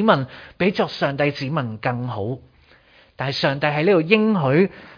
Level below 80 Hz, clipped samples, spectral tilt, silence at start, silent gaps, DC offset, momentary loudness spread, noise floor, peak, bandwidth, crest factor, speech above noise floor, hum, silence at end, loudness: -56 dBFS; under 0.1%; -7.5 dB/octave; 0 s; none; under 0.1%; 11 LU; -53 dBFS; 0 dBFS; 5.2 kHz; 20 dB; 33 dB; none; 0.05 s; -20 LUFS